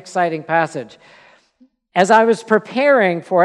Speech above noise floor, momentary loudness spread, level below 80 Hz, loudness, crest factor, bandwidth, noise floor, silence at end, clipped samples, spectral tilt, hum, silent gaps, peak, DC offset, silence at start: 40 dB; 10 LU; -72 dBFS; -16 LUFS; 16 dB; 11.5 kHz; -56 dBFS; 0 s; under 0.1%; -5 dB/octave; none; none; 0 dBFS; under 0.1%; 0.05 s